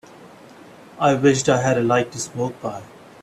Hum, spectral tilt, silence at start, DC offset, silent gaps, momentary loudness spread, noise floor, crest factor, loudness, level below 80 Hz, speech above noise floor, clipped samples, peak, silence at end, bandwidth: none; -5 dB/octave; 0.2 s; under 0.1%; none; 15 LU; -44 dBFS; 18 dB; -20 LUFS; -58 dBFS; 25 dB; under 0.1%; -2 dBFS; 0.35 s; 13 kHz